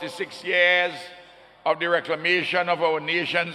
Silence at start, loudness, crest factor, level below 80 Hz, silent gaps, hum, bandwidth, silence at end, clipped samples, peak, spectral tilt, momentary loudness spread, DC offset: 0 s; -22 LUFS; 18 dB; -72 dBFS; none; none; 12.5 kHz; 0 s; under 0.1%; -6 dBFS; -4 dB/octave; 13 LU; under 0.1%